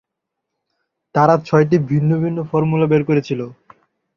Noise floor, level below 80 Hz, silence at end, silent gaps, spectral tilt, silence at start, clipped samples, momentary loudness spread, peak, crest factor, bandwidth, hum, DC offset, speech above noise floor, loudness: -79 dBFS; -54 dBFS; 0.65 s; none; -9 dB/octave; 1.15 s; under 0.1%; 9 LU; -2 dBFS; 16 dB; 6.8 kHz; none; under 0.1%; 64 dB; -17 LUFS